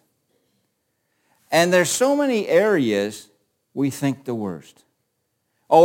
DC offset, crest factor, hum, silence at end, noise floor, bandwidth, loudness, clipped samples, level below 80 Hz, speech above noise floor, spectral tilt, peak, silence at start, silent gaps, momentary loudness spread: under 0.1%; 20 dB; none; 0 s; -73 dBFS; 17 kHz; -20 LUFS; under 0.1%; -68 dBFS; 53 dB; -4.5 dB/octave; -2 dBFS; 1.5 s; none; 14 LU